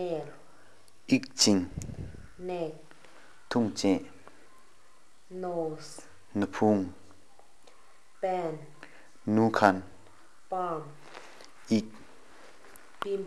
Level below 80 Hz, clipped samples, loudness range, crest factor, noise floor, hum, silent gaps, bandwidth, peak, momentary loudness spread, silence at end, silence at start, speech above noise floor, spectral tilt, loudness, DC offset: -62 dBFS; under 0.1%; 4 LU; 28 dB; -63 dBFS; none; none; 12 kHz; -4 dBFS; 26 LU; 0 s; 0 s; 34 dB; -4.5 dB/octave; -30 LUFS; 0.4%